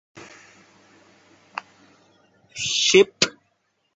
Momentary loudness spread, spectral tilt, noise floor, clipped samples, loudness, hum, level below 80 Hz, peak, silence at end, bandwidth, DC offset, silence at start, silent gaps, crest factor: 23 LU; -2 dB/octave; -70 dBFS; under 0.1%; -19 LUFS; none; -64 dBFS; -2 dBFS; 0.65 s; 8.2 kHz; under 0.1%; 0.15 s; none; 24 dB